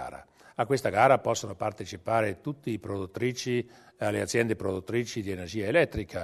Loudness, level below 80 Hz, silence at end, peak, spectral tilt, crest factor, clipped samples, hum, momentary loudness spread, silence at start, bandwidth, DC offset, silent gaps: -29 LUFS; -56 dBFS; 0 s; -6 dBFS; -5 dB/octave; 22 dB; under 0.1%; none; 13 LU; 0 s; 13.5 kHz; under 0.1%; none